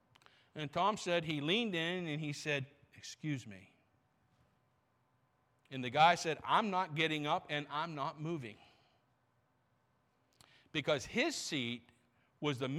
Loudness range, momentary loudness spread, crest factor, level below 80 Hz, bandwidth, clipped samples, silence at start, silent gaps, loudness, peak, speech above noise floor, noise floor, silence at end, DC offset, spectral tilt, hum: 11 LU; 13 LU; 24 dB; -76 dBFS; 14.5 kHz; under 0.1%; 0.55 s; none; -36 LUFS; -16 dBFS; 40 dB; -76 dBFS; 0 s; under 0.1%; -4.5 dB/octave; none